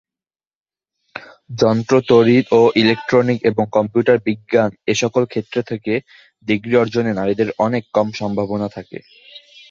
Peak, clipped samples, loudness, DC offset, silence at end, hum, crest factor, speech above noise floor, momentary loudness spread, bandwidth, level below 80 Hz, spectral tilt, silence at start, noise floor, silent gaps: 0 dBFS; under 0.1%; -17 LUFS; under 0.1%; 0.3 s; none; 16 dB; over 74 dB; 19 LU; 7.4 kHz; -54 dBFS; -6 dB/octave; 1.15 s; under -90 dBFS; none